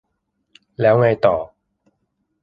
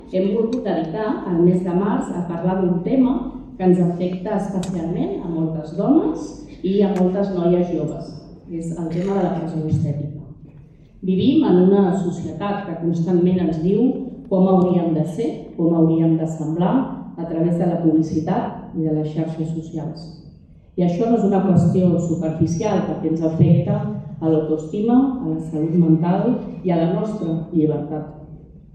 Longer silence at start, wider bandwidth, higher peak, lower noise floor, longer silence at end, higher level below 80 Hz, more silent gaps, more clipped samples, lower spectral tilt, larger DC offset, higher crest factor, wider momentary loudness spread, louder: first, 0.8 s vs 0 s; second, 5.2 kHz vs 8.6 kHz; about the same, -2 dBFS vs -4 dBFS; first, -72 dBFS vs -44 dBFS; first, 0.95 s vs 0.15 s; second, -54 dBFS vs -48 dBFS; neither; neither; about the same, -9.5 dB/octave vs -9 dB/octave; neither; about the same, 18 dB vs 16 dB; about the same, 12 LU vs 12 LU; first, -17 LUFS vs -20 LUFS